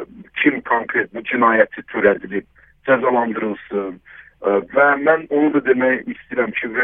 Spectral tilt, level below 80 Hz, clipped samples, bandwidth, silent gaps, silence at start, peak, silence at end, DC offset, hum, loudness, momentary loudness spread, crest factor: -9 dB/octave; -58 dBFS; under 0.1%; 3.8 kHz; none; 0 s; 0 dBFS; 0 s; under 0.1%; none; -18 LUFS; 11 LU; 18 dB